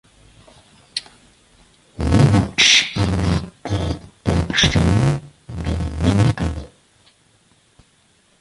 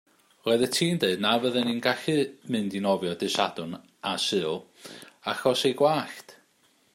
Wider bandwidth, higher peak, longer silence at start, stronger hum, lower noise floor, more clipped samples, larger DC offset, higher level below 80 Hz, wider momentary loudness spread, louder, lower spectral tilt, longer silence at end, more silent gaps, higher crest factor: second, 11.5 kHz vs 16 kHz; first, 0 dBFS vs -6 dBFS; first, 0.95 s vs 0.45 s; neither; second, -58 dBFS vs -65 dBFS; neither; neither; first, -30 dBFS vs -72 dBFS; about the same, 16 LU vs 14 LU; first, -18 LUFS vs -26 LUFS; about the same, -4.5 dB/octave vs -4 dB/octave; first, 1.75 s vs 0.6 s; neither; about the same, 20 dB vs 20 dB